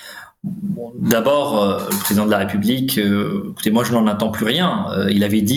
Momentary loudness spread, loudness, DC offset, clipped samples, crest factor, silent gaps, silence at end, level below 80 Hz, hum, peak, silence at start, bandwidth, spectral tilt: 10 LU; -18 LUFS; under 0.1%; under 0.1%; 16 dB; none; 0 s; -56 dBFS; none; -2 dBFS; 0 s; over 20 kHz; -5 dB/octave